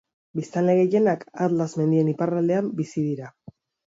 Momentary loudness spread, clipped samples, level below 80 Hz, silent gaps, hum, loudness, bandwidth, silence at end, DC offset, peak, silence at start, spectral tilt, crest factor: 13 LU; under 0.1%; -68 dBFS; none; none; -23 LUFS; 7.8 kHz; 0.65 s; under 0.1%; -10 dBFS; 0.35 s; -8.5 dB/octave; 14 dB